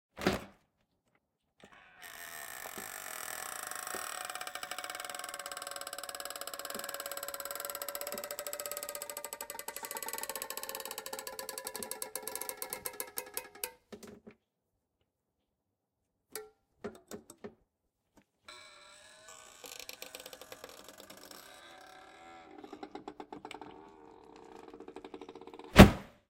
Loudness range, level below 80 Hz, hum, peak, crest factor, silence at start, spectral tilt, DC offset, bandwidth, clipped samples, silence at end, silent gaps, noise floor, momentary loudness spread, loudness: 12 LU; -46 dBFS; none; 0 dBFS; 36 dB; 0.15 s; -4.5 dB/octave; under 0.1%; 17 kHz; under 0.1%; 0.2 s; none; -85 dBFS; 14 LU; -34 LUFS